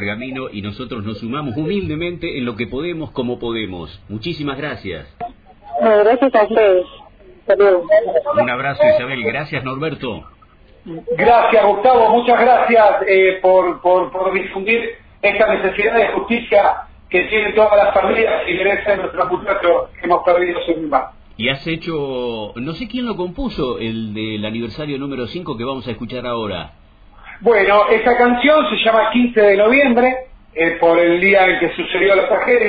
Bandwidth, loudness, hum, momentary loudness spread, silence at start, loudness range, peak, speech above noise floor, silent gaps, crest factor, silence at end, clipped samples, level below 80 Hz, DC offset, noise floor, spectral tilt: 5 kHz; -15 LUFS; none; 14 LU; 0 s; 10 LU; -2 dBFS; 31 dB; none; 14 dB; 0 s; under 0.1%; -44 dBFS; under 0.1%; -47 dBFS; -8.5 dB/octave